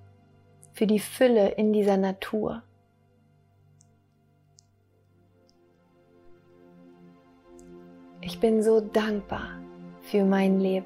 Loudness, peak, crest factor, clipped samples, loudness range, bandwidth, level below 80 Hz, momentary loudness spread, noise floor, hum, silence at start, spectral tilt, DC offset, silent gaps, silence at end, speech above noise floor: -25 LUFS; -8 dBFS; 20 dB; under 0.1%; 13 LU; 16 kHz; -60 dBFS; 20 LU; -64 dBFS; none; 0.75 s; -6.5 dB/octave; under 0.1%; none; 0 s; 40 dB